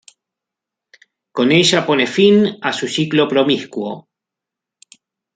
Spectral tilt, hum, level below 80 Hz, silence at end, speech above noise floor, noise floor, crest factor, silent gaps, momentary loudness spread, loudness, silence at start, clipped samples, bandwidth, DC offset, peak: -4.5 dB/octave; none; -62 dBFS; 1.35 s; 70 dB; -84 dBFS; 16 dB; none; 14 LU; -15 LUFS; 1.35 s; under 0.1%; 9.4 kHz; under 0.1%; -2 dBFS